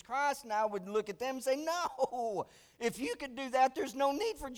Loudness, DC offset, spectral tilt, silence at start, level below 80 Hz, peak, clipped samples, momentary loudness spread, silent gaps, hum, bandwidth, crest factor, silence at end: -35 LUFS; under 0.1%; -3.5 dB/octave; 0.1 s; -64 dBFS; -18 dBFS; under 0.1%; 8 LU; none; none; over 20 kHz; 16 dB; 0 s